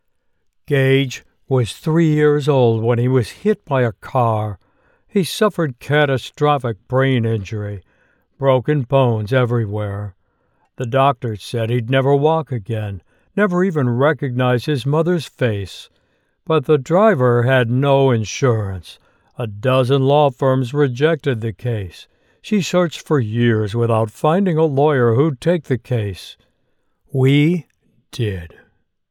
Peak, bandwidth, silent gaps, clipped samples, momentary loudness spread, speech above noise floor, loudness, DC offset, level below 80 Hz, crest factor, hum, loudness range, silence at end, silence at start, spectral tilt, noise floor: -2 dBFS; 13.5 kHz; none; under 0.1%; 12 LU; 47 dB; -17 LUFS; under 0.1%; -54 dBFS; 14 dB; none; 3 LU; 0.65 s; 0.7 s; -7 dB/octave; -64 dBFS